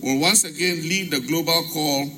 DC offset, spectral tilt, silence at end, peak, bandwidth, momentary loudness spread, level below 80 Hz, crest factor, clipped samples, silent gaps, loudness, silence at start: under 0.1%; -2.5 dB/octave; 0 s; -4 dBFS; 16.5 kHz; 6 LU; -62 dBFS; 18 dB; under 0.1%; none; -20 LUFS; 0 s